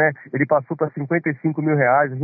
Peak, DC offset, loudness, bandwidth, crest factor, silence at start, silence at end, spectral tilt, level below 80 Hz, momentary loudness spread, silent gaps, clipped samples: -6 dBFS; under 0.1%; -20 LUFS; 2.6 kHz; 14 dB; 0 s; 0 s; -13.5 dB/octave; -68 dBFS; 7 LU; none; under 0.1%